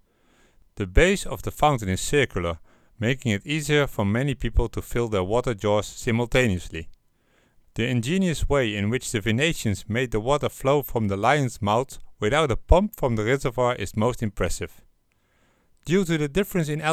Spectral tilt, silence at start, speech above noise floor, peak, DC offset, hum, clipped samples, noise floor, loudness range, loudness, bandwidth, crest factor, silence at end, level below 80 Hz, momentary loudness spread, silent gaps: -5.5 dB/octave; 0.75 s; 42 dB; -2 dBFS; under 0.1%; none; under 0.1%; -66 dBFS; 3 LU; -24 LUFS; 16 kHz; 22 dB; 0 s; -34 dBFS; 7 LU; none